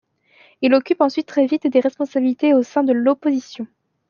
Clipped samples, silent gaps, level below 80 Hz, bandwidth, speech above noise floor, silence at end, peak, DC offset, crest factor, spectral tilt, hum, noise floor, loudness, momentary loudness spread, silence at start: under 0.1%; none; -72 dBFS; 7 kHz; 36 dB; 0.45 s; -2 dBFS; under 0.1%; 16 dB; -5.5 dB/octave; none; -54 dBFS; -18 LUFS; 8 LU; 0.6 s